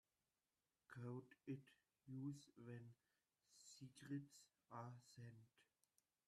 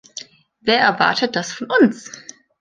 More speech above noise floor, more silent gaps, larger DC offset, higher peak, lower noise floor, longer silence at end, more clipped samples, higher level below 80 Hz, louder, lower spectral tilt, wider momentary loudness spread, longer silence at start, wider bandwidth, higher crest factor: first, over 33 dB vs 22 dB; neither; neither; second, -40 dBFS vs -2 dBFS; first, under -90 dBFS vs -39 dBFS; first, 0.65 s vs 0.4 s; neither; second, under -90 dBFS vs -64 dBFS; second, -58 LUFS vs -17 LUFS; first, -6.5 dB/octave vs -3.5 dB/octave; second, 10 LU vs 19 LU; first, 0.9 s vs 0.15 s; first, 13 kHz vs 9.6 kHz; about the same, 18 dB vs 18 dB